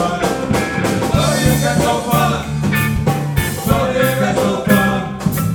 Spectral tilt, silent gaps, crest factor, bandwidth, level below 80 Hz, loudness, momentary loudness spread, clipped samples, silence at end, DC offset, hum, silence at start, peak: -5.5 dB/octave; none; 14 dB; over 20 kHz; -32 dBFS; -16 LUFS; 5 LU; under 0.1%; 0 s; under 0.1%; none; 0 s; -2 dBFS